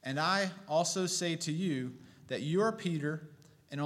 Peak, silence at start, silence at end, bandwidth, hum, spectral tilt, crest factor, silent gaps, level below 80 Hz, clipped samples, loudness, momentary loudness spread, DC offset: -14 dBFS; 0.05 s; 0 s; 15.5 kHz; none; -4 dB/octave; 20 dB; none; -78 dBFS; under 0.1%; -33 LUFS; 10 LU; under 0.1%